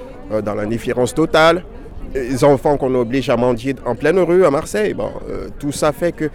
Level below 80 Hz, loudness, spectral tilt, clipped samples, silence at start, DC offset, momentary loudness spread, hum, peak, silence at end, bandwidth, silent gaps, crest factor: -36 dBFS; -17 LUFS; -5.5 dB/octave; under 0.1%; 0 s; under 0.1%; 12 LU; none; -2 dBFS; 0 s; 16.5 kHz; none; 14 dB